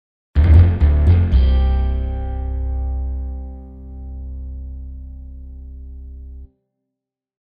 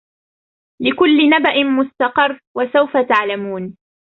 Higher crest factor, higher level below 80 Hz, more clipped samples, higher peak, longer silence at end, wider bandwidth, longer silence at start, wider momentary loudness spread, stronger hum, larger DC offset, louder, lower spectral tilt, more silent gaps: about the same, 18 dB vs 14 dB; first, -20 dBFS vs -60 dBFS; neither; about the same, 0 dBFS vs -2 dBFS; first, 1 s vs 0.4 s; about the same, 4.9 kHz vs 4.8 kHz; second, 0.35 s vs 0.8 s; first, 24 LU vs 11 LU; neither; neither; about the same, -17 LUFS vs -15 LUFS; first, -10 dB/octave vs -6.5 dB/octave; second, none vs 2.47-2.55 s